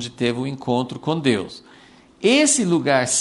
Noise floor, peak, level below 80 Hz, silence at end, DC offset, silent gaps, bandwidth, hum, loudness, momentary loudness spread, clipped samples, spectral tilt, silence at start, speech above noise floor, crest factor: -48 dBFS; -4 dBFS; -58 dBFS; 0 s; under 0.1%; none; 11.5 kHz; none; -19 LUFS; 9 LU; under 0.1%; -3.5 dB/octave; 0 s; 28 dB; 18 dB